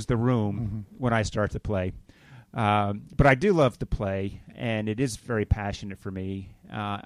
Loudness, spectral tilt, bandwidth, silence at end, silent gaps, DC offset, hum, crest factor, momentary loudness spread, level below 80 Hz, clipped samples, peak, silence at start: -27 LUFS; -6.5 dB/octave; 13 kHz; 0.05 s; none; under 0.1%; none; 20 dB; 14 LU; -40 dBFS; under 0.1%; -8 dBFS; 0 s